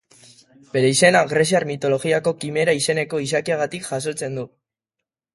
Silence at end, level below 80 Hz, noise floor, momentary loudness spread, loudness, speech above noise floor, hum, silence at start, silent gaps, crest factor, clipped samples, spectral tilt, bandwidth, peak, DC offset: 0.9 s; -62 dBFS; -84 dBFS; 12 LU; -20 LUFS; 64 dB; none; 0.75 s; none; 20 dB; under 0.1%; -4 dB/octave; 12 kHz; 0 dBFS; under 0.1%